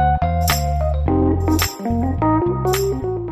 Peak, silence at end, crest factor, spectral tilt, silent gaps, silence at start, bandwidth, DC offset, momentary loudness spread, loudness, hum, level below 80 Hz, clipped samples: -6 dBFS; 0 s; 12 dB; -5.5 dB/octave; none; 0 s; 15.5 kHz; under 0.1%; 3 LU; -19 LUFS; none; -26 dBFS; under 0.1%